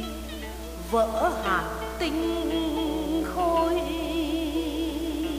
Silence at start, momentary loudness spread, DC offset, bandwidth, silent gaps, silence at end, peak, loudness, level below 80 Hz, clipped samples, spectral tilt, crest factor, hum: 0 s; 11 LU; under 0.1%; 15.5 kHz; none; 0 s; -12 dBFS; -27 LUFS; -40 dBFS; under 0.1%; -5 dB/octave; 16 dB; none